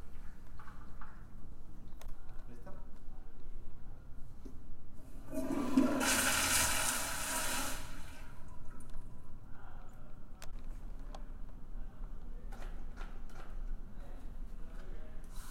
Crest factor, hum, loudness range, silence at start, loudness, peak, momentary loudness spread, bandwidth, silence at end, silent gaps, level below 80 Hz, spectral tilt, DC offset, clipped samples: 20 dB; none; 22 LU; 0 s; -33 LUFS; -16 dBFS; 25 LU; 16.5 kHz; 0 s; none; -44 dBFS; -2.5 dB/octave; under 0.1%; under 0.1%